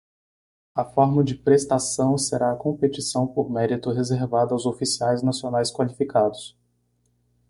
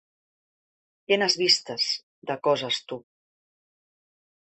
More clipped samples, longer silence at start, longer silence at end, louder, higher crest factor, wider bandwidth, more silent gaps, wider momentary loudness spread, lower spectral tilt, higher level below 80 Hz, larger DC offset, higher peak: neither; second, 0.75 s vs 1.1 s; second, 1 s vs 1.5 s; about the same, -23 LUFS vs -24 LUFS; about the same, 18 dB vs 22 dB; first, 11.5 kHz vs 8.6 kHz; second, none vs 2.03-2.22 s; second, 6 LU vs 14 LU; first, -5.5 dB/octave vs -2.5 dB/octave; first, -58 dBFS vs -76 dBFS; neither; about the same, -4 dBFS vs -6 dBFS